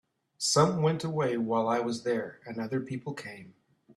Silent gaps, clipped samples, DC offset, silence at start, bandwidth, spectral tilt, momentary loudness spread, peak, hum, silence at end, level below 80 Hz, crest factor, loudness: none; under 0.1%; under 0.1%; 0.4 s; 13.5 kHz; -5 dB/octave; 15 LU; -10 dBFS; none; 0.45 s; -68 dBFS; 20 dB; -29 LUFS